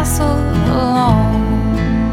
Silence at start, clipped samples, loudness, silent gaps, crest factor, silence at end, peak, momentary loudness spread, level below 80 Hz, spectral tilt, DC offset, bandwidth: 0 s; under 0.1%; -15 LUFS; none; 12 dB; 0 s; 0 dBFS; 3 LU; -22 dBFS; -6.5 dB/octave; under 0.1%; 17.5 kHz